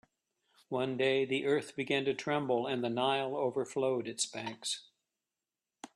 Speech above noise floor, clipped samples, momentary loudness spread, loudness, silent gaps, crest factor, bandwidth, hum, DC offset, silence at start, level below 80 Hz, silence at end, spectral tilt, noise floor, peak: over 57 dB; under 0.1%; 7 LU; -33 LUFS; none; 18 dB; 12.5 kHz; none; under 0.1%; 0.7 s; -78 dBFS; 0.1 s; -4 dB/octave; under -90 dBFS; -18 dBFS